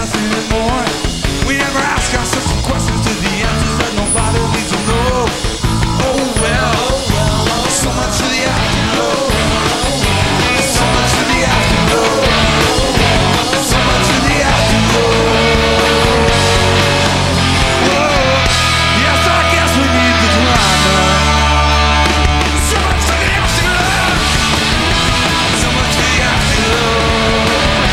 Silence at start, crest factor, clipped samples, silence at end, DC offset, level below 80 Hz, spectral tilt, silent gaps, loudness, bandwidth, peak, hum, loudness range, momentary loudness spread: 0 s; 12 dB; under 0.1%; 0 s; 0.7%; -20 dBFS; -3.5 dB/octave; none; -12 LUFS; 16.5 kHz; 0 dBFS; none; 4 LU; 5 LU